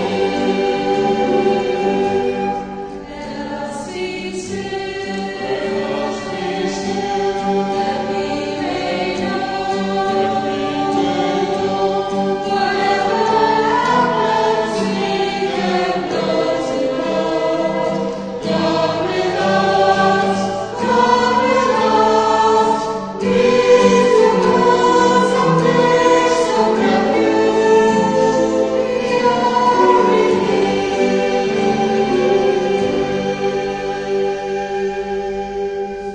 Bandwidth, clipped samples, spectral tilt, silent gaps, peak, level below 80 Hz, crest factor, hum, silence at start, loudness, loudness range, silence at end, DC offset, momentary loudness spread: 9.8 kHz; under 0.1%; -5 dB/octave; none; 0 dBFS; -46 dBFS; 16 dB; none; 0 s; -16 LUFS; 8 LU; 0 s; under 0.1%; 10 LU